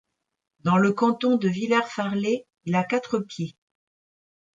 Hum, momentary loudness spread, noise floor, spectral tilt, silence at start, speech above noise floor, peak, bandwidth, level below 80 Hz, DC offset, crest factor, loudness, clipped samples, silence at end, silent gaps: none; 9 LU; under -90 dBFS; -6.5 dB/octave; 0.65 s; over 67 dB; -10 dBFS; 7.8 kHz; -70 dBFS; under 0.1%; 16 dB; -24 LUFS; under 0.1%; 1.1 s; none